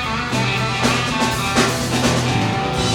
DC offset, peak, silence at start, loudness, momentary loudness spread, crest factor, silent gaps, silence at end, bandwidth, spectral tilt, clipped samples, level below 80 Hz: under 0.1%; -2 dBFS; 0 s; -18 LUFS; 3 LU; 16 dB; none; 0 s; 18 kHz; -4 dB/octave; under 0.1%; -36 dBFS